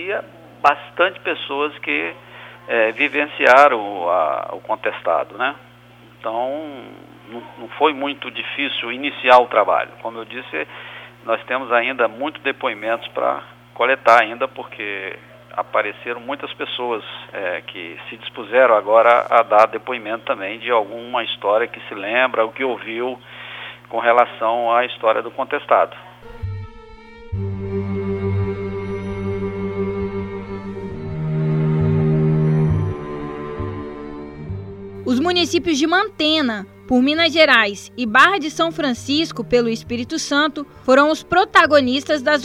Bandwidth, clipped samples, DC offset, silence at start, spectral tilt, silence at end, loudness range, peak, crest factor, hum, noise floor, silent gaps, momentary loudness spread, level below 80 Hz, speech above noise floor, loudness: 13.5 kHz; under 0.1%; under 0.1%; 0 s; -5.5 dB/octave; 0 s; 9 LU; 0 dBFS; 20 dB; none; -46 dBFS; none; 18 LU; -46 dBFS; 27 dB; -18 LUFS